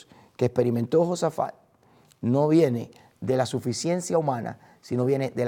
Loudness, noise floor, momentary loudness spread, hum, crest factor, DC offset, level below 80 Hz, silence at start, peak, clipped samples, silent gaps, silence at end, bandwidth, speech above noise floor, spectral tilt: -25 LUFS; -59 dBFS; 11 LU; none; 16 dB; under 0.1%; -66 dBFS; 0.4 s; -8 dBFS; under 0.1%; none; 0 s; 17 kHz; 35 dB; -6.5 dB/octave